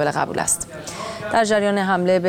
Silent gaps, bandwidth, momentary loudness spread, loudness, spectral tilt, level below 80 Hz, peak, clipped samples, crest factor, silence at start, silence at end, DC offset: none; 17 kHz; 12 LU; -20 LUFS; -4 dB/octave; -52 dBFS; -4 dBFS; under 0.1%; 16 dB; 0 s; 0 s; under 0.1%